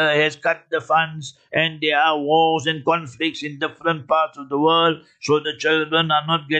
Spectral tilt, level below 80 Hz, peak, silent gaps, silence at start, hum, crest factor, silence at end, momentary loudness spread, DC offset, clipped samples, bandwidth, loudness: -4.5 dB/octave; -68 dBFS; -4 dBFS; none; 0 s; none; 16 dB; 0 s; 8 LU; under 0.1%; under 0.1%; 8.8 kHz; -20 LUFS